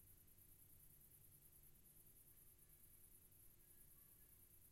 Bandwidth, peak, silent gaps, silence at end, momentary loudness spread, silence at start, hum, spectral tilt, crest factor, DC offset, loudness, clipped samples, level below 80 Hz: 16 kHz; -54 dBFS; none; 0 s; 1 LU; 0 s; none; -3 dB/octave; 14 dB; under 0.1%; -67 LUFS; under 0.1%; -76 dBFS